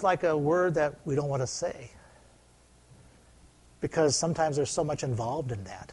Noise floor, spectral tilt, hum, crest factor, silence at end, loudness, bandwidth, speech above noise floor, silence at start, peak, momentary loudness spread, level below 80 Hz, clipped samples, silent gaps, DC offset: -59 dBFS; -5 dB/octave; none; 18 dB; 0 s; -29 LUFS; 11.5 kHz; 31 dB; 0 s; -12 dBFS; 11 LU; -58 dBFS; under 0.1%; none; under 0.1%